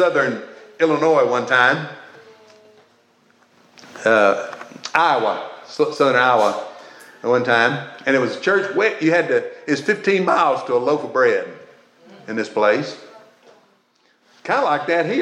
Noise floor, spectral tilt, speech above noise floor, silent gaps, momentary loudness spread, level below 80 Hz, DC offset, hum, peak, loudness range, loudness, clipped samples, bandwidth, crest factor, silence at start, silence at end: -60 dBFS; -5 dB/octave; 42 dB; none; 15 LU; -80 dBFS; under 0.1%; none; 0 dBFS; 5 LU; -18 LUFS; under 0.1%; 11 kHz; 18 dB; 0 s; 0 s